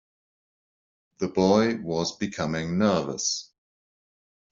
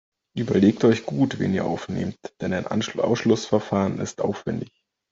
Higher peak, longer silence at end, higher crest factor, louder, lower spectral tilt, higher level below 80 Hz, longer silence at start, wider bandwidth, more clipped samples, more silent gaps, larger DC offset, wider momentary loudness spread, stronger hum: about the same, -6 dBFS vs -6 dBFS; first, 1.1 s vs 0.45 s; about the same, 22 dB vs 18 dB; about the same, -25 LUFS vs -24 LUFS; second, -5 dB/octave vs -6.5 dB/octave; about the same, -60 dBFS vs -60 dBFS; first, 1.2 s vs 0.35 s; about the same, 7.8 kHz vs 7.8 kHz; neither; neither; neither; second, 9 LU vs 12 LU; neither